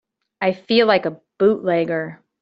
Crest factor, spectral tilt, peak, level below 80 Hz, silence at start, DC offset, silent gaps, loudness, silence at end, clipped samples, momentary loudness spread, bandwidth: 18 dB; -7.5 dB/octave; -2 dBFS; -64 dBFS; 0.4 s; under 0.1%; none; -19 LUFS; 0.25 s; under 0.1%; 11 LU; 5.8 kHz